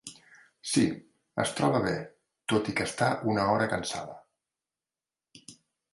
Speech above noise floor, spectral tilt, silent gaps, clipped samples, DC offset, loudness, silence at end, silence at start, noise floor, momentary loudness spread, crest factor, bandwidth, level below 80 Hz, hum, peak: over 62 dB; -4.5 dB/octave; none; under 0.1%; under 0.1%; -29 LUFS; 0.4 s; 0.05 s; under -90 dBFS; 18 LU; 22 dB; 11.5 kHz; -62 dBFS; none; -10 dBFS